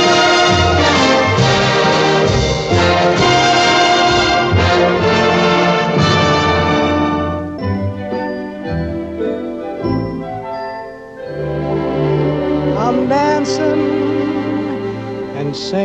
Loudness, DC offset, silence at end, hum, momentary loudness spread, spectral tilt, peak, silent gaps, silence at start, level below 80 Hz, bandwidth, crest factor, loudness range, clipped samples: -14 LUFS; 0.1%; 0 s; none; 12 LU; -5 dB/octave; 0 dBFS; none; 0 s; -34 dBFS; 9.4 kHz; 14 dB; 10 LU; under 0.1%